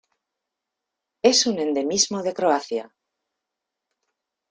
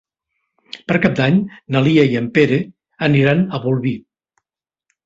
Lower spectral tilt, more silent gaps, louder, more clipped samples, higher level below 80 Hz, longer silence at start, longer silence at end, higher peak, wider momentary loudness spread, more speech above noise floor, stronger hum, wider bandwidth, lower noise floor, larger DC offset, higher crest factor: second, -2 dB/octave vs -8 dB/octave; neither; second, -21 LUFS vs -16 LUFS; neither; second, -68 dBFS vs -52 dBFS; first, 1.25 s vs 0.75 s; first, 1.65 s vs 1.05 s; about the same, -4 dBFS vs -2 dBFS; second, 8 LU vs 13 LU; second, 63 dB vs 71 dB; neither; first, 11 kHz vs 7.6 kHz; about the same, -84 dBFS vs -86 dBFS; neither; first, 22 dB vs 16 dB